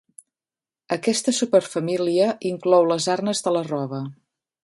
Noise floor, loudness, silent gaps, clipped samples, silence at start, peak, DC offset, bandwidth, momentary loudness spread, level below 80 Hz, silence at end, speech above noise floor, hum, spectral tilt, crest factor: under -90 dBFS; -22 LUFS; none; under 0.1%; 0.9 s; -4 dBFS; under 0.1%; 11.5 kHz; 10 LU; -70 dBFS; 0.5 s; over 69 dB; none; -4.5 dB/octave; 18 dB